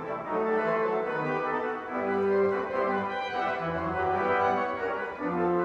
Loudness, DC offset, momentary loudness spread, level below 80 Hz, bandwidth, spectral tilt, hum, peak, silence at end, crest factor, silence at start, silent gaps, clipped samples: -28 LUFS; under 0.1%; 6 LU; -62 dBFS; 7.2 kHz; -7.5 dB/octave; none; -14 dBFS; 0 s; 14 dB; 0 s; none; under 0.1%